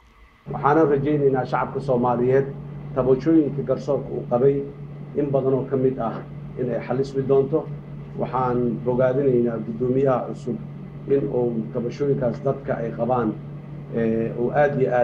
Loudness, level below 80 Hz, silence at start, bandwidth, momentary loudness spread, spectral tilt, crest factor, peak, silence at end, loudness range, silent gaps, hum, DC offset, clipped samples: -22 LUFS; -50 dBFS; 0.45 s; 7 kHz; 12 LU; -9.5 dB/octave; 18 dB; -4 dBFS; 0 s; 3 LU; none; none; under 0.1%; under 0.1%